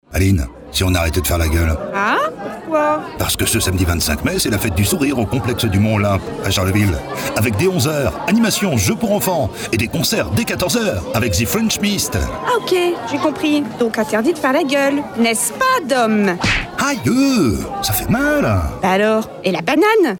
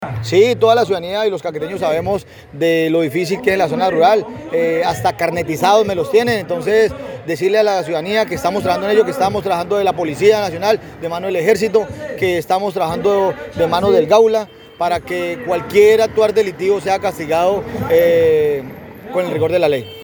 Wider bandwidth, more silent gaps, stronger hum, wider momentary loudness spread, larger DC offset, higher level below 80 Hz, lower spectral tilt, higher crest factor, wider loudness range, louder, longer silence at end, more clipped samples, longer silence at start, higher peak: about the same, over 20 kHz vs over 20 kHz; neither; neither; second, 4 LU vs 9 LU; neither; first, -32 dBFS vs -48 dBFS; about the same, -4.5 dB/octave vs -5.5 dB/octave; about the same, 12 dB vs 16 dB; about the same, 1 LU vs 2 LU; about the same, -17 LUFS vs -16 LUFS; about the same, 0 s vs 0 s; neither; about the same, 0.1 s vs 0 s; second, -4 dBFS vs 0 dBFS